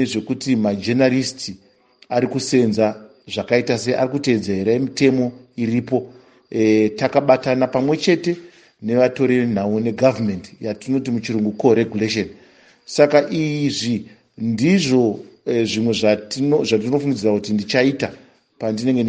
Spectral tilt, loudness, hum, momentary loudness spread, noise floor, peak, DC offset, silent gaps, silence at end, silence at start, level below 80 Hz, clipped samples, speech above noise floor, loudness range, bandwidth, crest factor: -5.5 dB/octave; -19 LUFS; none; 10 LU; -49 dBFS; 0 dBFS; under 0.1%; none; 0 s; 0 s; -58 dBFS; under 0.1%; 31 dB; 2 LU; 9.4 kHz; 18 dB